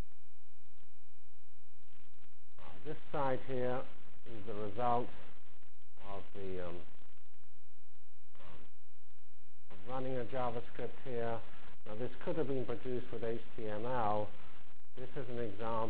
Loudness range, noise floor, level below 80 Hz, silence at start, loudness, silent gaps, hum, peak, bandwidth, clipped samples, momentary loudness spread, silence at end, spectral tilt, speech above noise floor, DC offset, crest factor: 11 LU; -70 dBFS; -64 dBFS; 0 s; -41 LUFS; none; none; -20 dBFS; 4 kHz; under 0.1%; 22 LU; 0 s; -9.5 dB/octave; 30 dB; 4%; 22 dB